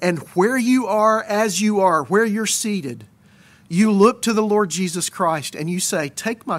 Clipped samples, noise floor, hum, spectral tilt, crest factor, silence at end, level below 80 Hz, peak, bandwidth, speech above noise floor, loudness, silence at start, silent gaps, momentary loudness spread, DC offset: under 0.1%; -50 dBFS; none; -4.5 dB/octave; 16 dB; 0 s; -64 dBFS; -2 dBFS; 16 kHz; 32 dB; -19 LUFS; 0 s; none; 9 LU; under 0.1%